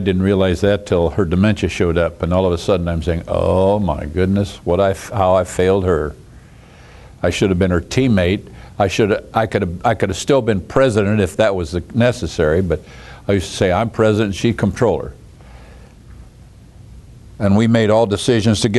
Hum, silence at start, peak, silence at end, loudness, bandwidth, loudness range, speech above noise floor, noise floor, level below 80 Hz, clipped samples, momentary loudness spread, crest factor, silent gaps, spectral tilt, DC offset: none; 0 s; 0 dBFS; 0 s; -17 LUFS; 12 kHz; 3 LU; 26 dB; -42 dBFS; -36 dBFS; under 0.1%; 6 LU; 16 dB; none; -6.5 dB/octave; under 0.1%